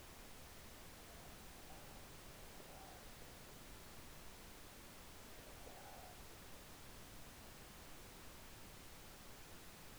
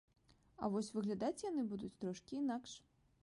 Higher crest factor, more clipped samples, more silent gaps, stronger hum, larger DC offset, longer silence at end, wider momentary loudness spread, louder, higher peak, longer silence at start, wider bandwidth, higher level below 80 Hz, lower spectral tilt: about the same, 14 dB vs 16 dB; neither; neither; neither; neither; second, 0 s vs 0.45 s; second, 1 LU vs 7 LU; second, -57 LUFS vs -43 LUFS; second, -42 dBFS vs -26 dBFS; second, 0 s vs 0.6 s; first, over 20 kHz vs 11.5 kHz; first, -64 dBFS vs -74 dBFS; second, -3 dB/octave vs -6 dB/octave